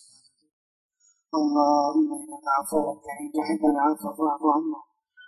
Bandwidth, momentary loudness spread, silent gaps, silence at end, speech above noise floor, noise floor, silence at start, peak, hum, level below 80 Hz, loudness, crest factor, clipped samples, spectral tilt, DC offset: 14 kHz; 11 LU; none; 0.05 s; 34 dB; -58 dBFS; 1.35 s; -6 dBFS; none; -68 dBFS; -25 LUFS; 20 dB; under 0.1%; -5 dB/octave; under 0.1%